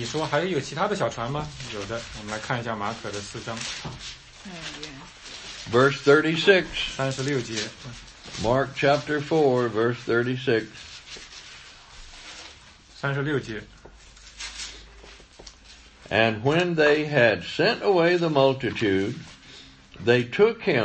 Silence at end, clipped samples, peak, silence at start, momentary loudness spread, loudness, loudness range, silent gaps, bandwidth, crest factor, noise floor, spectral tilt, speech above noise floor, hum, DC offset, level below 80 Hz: 0 s; under 0.1%; -4 dBFS; 0 s; 21 LU; -24 LUFS; 12 LU; none; 8.8 kHz; 22 dB; -49 dBFS; -5 dB/octave; 26 dB; none; under 0.1%; -52 dBFS